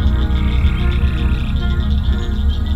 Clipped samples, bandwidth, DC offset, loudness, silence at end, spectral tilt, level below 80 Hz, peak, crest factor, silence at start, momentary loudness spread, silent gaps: under 0.1%; 5.4 kHz; under 0.1%; -18 LUFS; 0 s; -7.5 dB/octave; -16 dBFS; -2 dBFS; 12 dB; 0 s; 2 LU; none